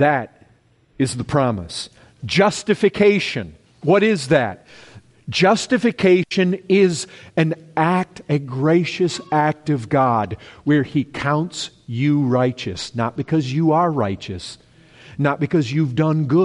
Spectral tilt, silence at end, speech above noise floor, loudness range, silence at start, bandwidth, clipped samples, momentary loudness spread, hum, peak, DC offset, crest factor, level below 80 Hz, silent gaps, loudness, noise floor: -6 dB/octave; 0 s; 38 dB; 3 LU; 0 s; 11.5 kHz; under 0.1%; 13 LU; none; -4 dBFS; under 0.1%; 16 dB; -52 dBFS; none; -19 LUFS; -56 dBFS